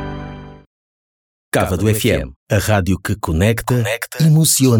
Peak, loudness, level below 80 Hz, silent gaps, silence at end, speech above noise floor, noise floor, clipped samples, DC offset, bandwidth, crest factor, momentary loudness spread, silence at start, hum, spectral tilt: -2 dBFS; -16 LUFS; -34 dBFS; 0.66-1.52 s, 2.36-2.46 s; 0 s; over 75 dB; under -90 dBFS; under 0.1%; under 0.1%; 19 kHz; 14 dB; 13 LU; 0 s; none; -5 dB/octave